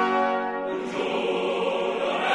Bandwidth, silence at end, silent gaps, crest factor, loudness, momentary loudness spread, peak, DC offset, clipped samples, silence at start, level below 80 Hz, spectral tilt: 11 kHz; 0 s; none; 16 dB; -26 LUFS; 5 LU; -10 dBFS; under 0.1%; under 0.1%; 0 s; -68 dBFS; -4.5 dB/octave